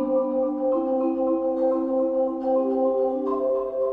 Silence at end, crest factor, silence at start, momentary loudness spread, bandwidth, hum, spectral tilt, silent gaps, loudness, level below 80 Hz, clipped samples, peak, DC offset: 0 s; 10 dB; 0 s; 2 LU; 3.1 kHz; none; -9.5 dB/octave; none; -24 LUFS; -60 dBFS; under 0.1%; -12 dBFS; under 0.1%